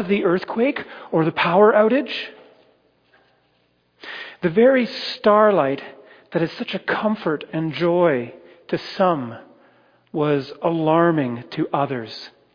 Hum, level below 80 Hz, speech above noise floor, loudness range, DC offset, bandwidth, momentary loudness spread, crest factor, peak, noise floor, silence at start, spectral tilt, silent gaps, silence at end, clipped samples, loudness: none; -66 dBFS; 44 dB; 3 LU; under 0.1%; 5.2 kHz; 18 LU; 18 dB; -4 dBFS; -64 dBFS; 0 s; -8 dB/octave; none; 0.25 s; under 0.1%; -20 LUFS